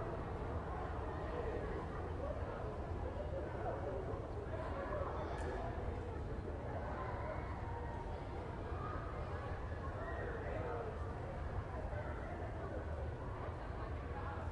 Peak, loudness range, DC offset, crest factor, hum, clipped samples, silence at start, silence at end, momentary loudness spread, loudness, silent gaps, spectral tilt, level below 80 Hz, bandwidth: -28 dBFS; 1 LU; under 0.1%; 16 dB; none; under 0.1%; 0 s; 0 s; 3 LU; -44 LUFS; none; -8 dB/octave; -48 dBFS; 10.5 kHz